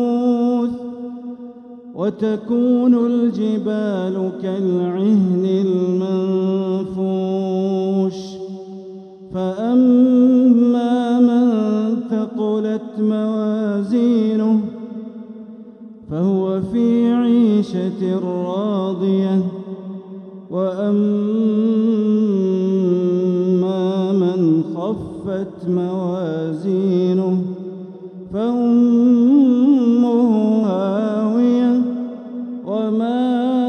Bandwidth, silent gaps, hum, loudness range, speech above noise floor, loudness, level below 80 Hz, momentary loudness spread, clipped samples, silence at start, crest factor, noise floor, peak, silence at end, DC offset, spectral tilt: 6.4 kHz; none; none; 5 LU; 20 dB; -17 LUFS; -60 dBFS; 17 LU; under 0.1%; 0 s; 14 dB; -38 dBFS; -4 dBFS; 0 s; under 0.1%; -9 dB/octave